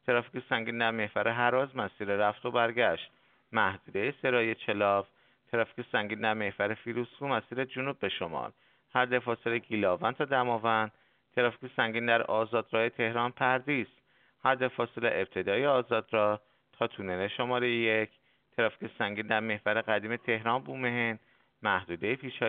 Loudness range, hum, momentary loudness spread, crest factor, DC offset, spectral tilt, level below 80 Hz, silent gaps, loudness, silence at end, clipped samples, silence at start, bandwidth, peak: 3 LU; none; 7 LU; 22 dB; under 0.1%; -2.5 dB/octave; -74 dBFS; none; -31 LUFS; 0 s; under 0.1%; 0.05 s; 4.6 kHz; -10 dBFS